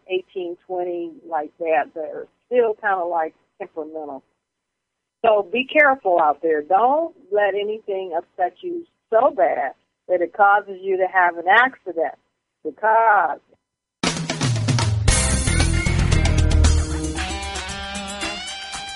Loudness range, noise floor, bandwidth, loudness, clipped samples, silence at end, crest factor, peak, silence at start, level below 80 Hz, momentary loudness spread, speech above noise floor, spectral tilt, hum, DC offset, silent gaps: 5 LU; -80 dBFS; 11.5 kHz; -20 LUFS; under 0.1%; 0 s; 20 dB; -2 dBFS; 0.1 s; -30 dBFS; 15 LU; 60 dB; -4.5 dB/octave; none; under 0.1%; none